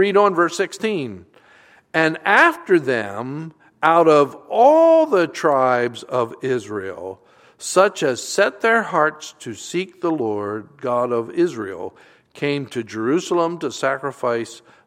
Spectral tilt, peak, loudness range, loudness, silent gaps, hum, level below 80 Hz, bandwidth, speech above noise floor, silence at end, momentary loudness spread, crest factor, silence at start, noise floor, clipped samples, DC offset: -4.5 dB/octave; 0 dBFS; 7 LU; -19 LUFS; none; none; -70 dBFS; 15.5 kHz; 32 dB; 0.3 s; 16 LU; 20 dB; 0 s; -51 dBFS; under 0.1%; under 0.1%